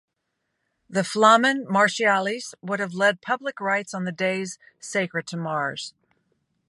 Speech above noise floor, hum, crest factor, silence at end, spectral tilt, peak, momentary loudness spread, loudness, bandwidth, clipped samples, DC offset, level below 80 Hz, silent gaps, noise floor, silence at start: 55 dB; none; 22 dB; 0.8 s; -4 dB/octave; -2 dBFS; 13 LU; -23 LUFS; 11.5 kHz; under 0.1%; under 0.1%; -76 dBFS; none; -78 dBFS; 0.9 s